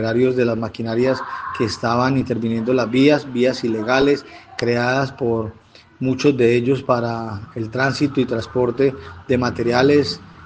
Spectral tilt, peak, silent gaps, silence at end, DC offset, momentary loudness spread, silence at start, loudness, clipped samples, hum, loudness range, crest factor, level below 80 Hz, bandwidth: -6.5 dB/octave; 0 dBFS; none; 0 s; under 0.1%; 10 LU; 0 s; -19 LUFS; under 0.1%; none; 2 LU; 18 dB; -52 dBFS; 9.2 kHz